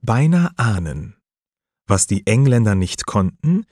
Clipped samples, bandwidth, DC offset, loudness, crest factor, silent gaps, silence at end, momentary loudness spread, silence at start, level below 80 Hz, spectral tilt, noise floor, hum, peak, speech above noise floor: under 0.1%; 13 kHz; under 0.1%; -17 LUFS; 16 dB; none; 0.1 s; 10 LU; 0.05 s; -42 dBFS; -6 dB/octave; under -90 dBFS; none; -2 dBFS; over 73 dB